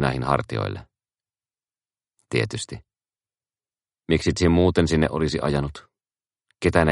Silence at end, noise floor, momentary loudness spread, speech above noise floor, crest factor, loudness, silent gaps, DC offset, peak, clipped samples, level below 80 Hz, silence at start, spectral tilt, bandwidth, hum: 0 s; under -90 dBFS; 14 LU; over 68 dB; 24 dB; -23 LUFS; none; under 0.1%; 0 dBFS; under 0.1%; -40 dBFS; 0 s; -6 dB/octave; 11.5 kHz; none